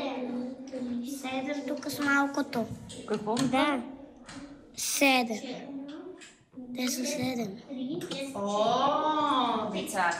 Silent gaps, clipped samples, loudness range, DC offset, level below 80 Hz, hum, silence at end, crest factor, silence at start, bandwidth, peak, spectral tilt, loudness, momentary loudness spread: none; under 0.1%; 3 LU; under 0.1%; -68 dBFS; none; 0 s; 18 dB; 0 s; 15.5 kHz; -12 dBFS; -3 dB/octave; -30 LUFS; 18 LU